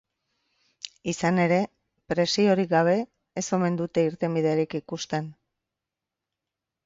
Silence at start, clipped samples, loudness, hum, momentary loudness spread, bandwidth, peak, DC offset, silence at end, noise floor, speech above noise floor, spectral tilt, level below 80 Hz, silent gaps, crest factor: 0.85 s; under 0.1%; -25 LUFS; none; 13 LU; 7.8 kHz; -8 dBFS; under 0.1%; 1.55 s; -87 dBFS; 63 dB; -5.5 dB/octave; -64 dBFS; none; 18 dB